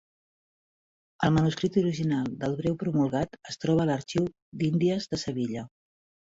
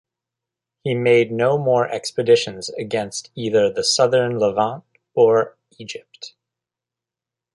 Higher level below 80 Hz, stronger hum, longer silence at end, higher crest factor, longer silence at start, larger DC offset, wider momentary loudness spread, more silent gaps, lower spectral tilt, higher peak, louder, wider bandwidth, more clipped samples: first, -56 dBFS vs -62 dBFS; neither; second, 0.75 s vs 1.25 s; about the same, 18 dB vs 18 dB; first, 1.2 s vs 0.85 s; neither; second, 8 LU vs 18 LU; first, 4.42-4.52 s vs none; first, -7 dB/octave vs -4.5 dB/octave; second, -10 dBFS vs -4 dBFS; second, -28 LUFS vs -19 LUFS; second, 7.8 kHz vs 11.5 kHz; neither